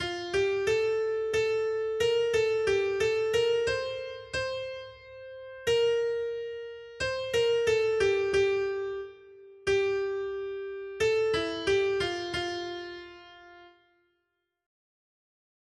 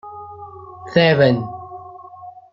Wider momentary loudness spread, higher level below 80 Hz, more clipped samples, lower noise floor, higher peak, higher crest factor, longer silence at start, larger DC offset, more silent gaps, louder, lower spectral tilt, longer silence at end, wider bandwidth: second, 14 LU vs 25 LU; about the same, -58 dBFS vs -60 dBFS; neither; first, -81 dBFS vs -39 dBFS; second, -14 dBFS vs -2 dBFS; second, 14 dB vs 20 dB; about the same, 0 s vs 0.05 s; neither; neither; second, -29 LUFS vs -16 LUFS; second, -4 dB/octave vs -8 dB/octave; first, 1.95 s vs 0.25 s; first, 12.5 kHz vs 7.4 kHz